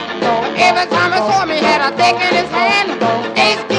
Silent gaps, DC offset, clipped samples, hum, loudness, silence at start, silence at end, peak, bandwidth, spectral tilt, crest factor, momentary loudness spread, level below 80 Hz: none; under 0.1%; under 0.1%; none; -13 LUFS; 0 s; 0 s; 0 dBFS; 11 kHz; -3.5 dB/octave; 14 dB; 4 LU; -52 dBFS